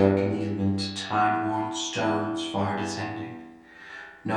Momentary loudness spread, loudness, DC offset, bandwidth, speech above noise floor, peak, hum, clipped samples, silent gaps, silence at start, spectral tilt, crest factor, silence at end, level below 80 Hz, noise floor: 17 LU; -27 LUFS; under 0.1%; 11 kHz; 21 dB; -6 dBFS; none; under 0.1%; none; 0 s; -5 dB/octave; 22 dB; 0 s; -66 dBFS; -47 dBFS